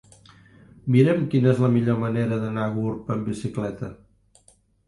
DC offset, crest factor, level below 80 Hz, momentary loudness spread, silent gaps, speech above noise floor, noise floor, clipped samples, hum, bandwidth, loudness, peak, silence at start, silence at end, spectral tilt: under 0.1%; 18 dB; -56 dBFS; 12 LU; none; 38 dB; -59 dBFS; under 0.1%; none; 11.5 kHz; -23 LUFS; -6 dBFS; 0.85 s; 0.9 s; -8.5 dB/octave